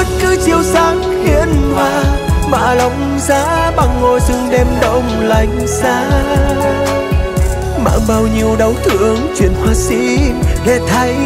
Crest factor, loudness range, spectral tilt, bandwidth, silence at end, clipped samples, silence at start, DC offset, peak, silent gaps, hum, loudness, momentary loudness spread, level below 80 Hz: 12 dB; 1 LU; -5.5 dB/octave; 16 kHz; 0 s; under 0.1%; 0 s; under 0.1%; 0 dBFS; none; none; -13 LUFS; 3 LU; -18 dBFS